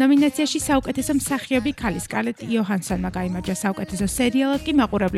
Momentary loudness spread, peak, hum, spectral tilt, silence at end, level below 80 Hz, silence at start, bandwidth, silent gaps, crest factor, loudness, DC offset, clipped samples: 6 LU; -6 dBFS; none; -4.5 dB/octave; 0 s; -42 dBFS; 0 s; 14.5 kHz; none; 14 dB; -22 LUFS; under 0.1%; under 0.1%